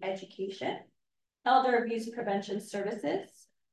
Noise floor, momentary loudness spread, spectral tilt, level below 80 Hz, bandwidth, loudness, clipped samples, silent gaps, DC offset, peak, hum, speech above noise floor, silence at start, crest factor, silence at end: -85 dBFS; 12 LU; -5 dB/octave; -82 dBFS; 12.5 kHz; -32 LUFS; under 0.1%; none; under 0.1%; -12 dBFS; none; 54 dB; 0 s; 22 dB; 0.45 s